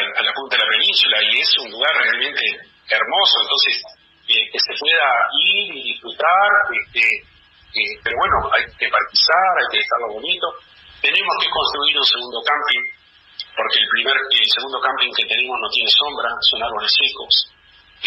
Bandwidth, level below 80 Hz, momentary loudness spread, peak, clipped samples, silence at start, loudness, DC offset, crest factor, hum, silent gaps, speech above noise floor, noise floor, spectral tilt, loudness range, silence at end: 13.5 kHz; -50 dBFS; 8 LU; -2 dBFS; under 0.1%; 0 s; -16 LUFS; under 0.1%; 16 dB; none; none; 26 dB; -44 dBFS; -2 dB/octave; 2 LU; 0 s